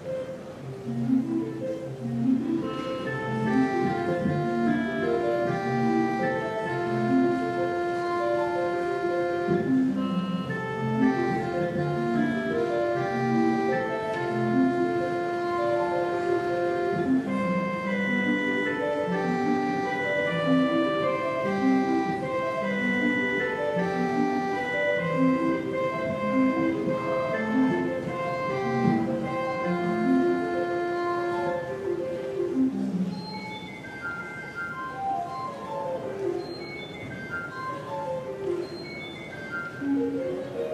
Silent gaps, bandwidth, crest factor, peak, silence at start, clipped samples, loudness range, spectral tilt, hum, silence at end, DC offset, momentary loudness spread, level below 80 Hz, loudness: none; 11.5 kHz; 16 dB; -10 dBFS; 0 s; under 0.1%; 7 LU; -7 dB/octave; none; 0 s; under 0.1%; 10 LU; -62 dBFS; -27 LUFS